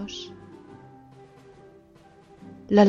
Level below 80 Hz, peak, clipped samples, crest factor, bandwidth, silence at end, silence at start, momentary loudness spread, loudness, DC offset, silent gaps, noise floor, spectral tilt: -62 dBFS; -4 dBFS; under 0.1%; 22 dB; 7.2 kHz; 0 s; 0 s; 17 LU; -29 LUFS; under 0.1%; none; -54 dBFS; -7 dB/octave